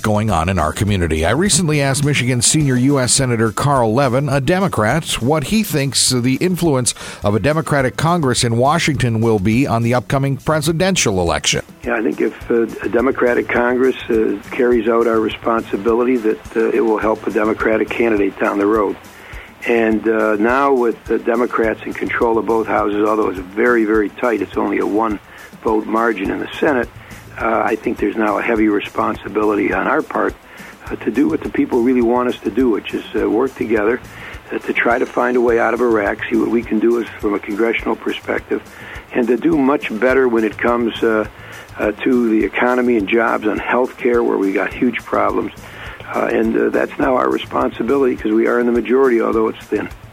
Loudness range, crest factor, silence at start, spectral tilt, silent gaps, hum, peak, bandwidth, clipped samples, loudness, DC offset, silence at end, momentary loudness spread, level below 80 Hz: 3 LU; 16 dB; 0 s; -5 dB/octave; none; none; 0 dBFS; 16.5 kHz; under 0.1%; -16 LUFS; under 0.1%; 0 s; 7 LU; -40 dBFS